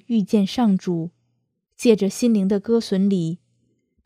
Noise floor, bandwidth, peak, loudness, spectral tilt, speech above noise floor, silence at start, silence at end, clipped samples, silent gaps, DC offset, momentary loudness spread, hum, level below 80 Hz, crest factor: -72 dBFS; 14.5 kHz; -2 dBFS; -20 LUFS; -6.5 dB/octave; 53 dB; 0.1 s; 0.7 s; under 0.1%; none; under 0.1%; 9 LU; none; -62 dBFS; 20 dB